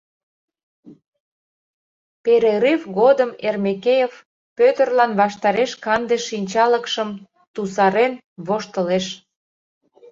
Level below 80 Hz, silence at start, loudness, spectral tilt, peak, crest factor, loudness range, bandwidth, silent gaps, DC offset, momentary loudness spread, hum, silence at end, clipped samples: -66 dBFS; 0.85 s; -19 LUFS; -5 dB/octave; -2 dBFS; 18 dB; 3 LU; 7.8 kHz; 1.07-1.12 s, 1.20-2.24 s, 4.25-4.56 s, 7.47-7.54 s, 8.24-8.36 s; under 0.1%; 11 LU; none; 0.95 s; under 0.1%